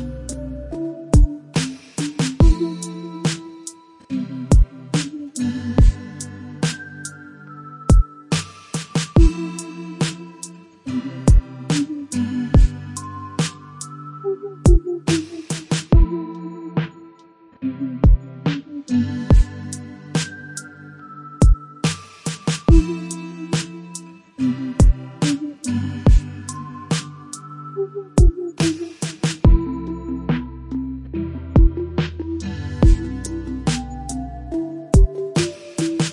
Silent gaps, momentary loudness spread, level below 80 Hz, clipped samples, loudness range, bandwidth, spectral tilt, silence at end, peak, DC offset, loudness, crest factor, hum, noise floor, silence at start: none; 16 LU; -22 dBFS; under 0.1%; 2 LU; 11.5 kHz; -6 dB/octave; 0 s; -2 dBFS; under 0.1%; -21 LUFS; 18 dB; none; -49 dBFS; 0 s